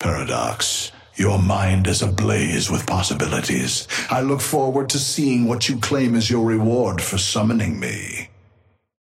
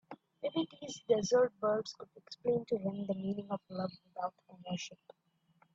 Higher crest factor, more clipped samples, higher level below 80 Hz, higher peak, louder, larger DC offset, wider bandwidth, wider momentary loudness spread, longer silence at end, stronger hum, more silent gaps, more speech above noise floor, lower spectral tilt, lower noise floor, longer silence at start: about the same, 16 dB vs 20 dB; neither; first, -46 dBFS vs -76 dBFS; first, -4 dBFS vs -18 dBFS; first, -20 LUFS vs -36 LUFS; neither; first, 16 kHz vs 7.8 kHz; second, 5 LU vs 16 LU; about the same, 0.75 s vs 0.8 s; neither; neither; about the same, 39 dB vs 36 dB; about the same, -4.5 dB/octave vs -5.5 dB/octave; second, -58 dBFS vs -72 dBFS; about the same, 0 s vs 0.1 s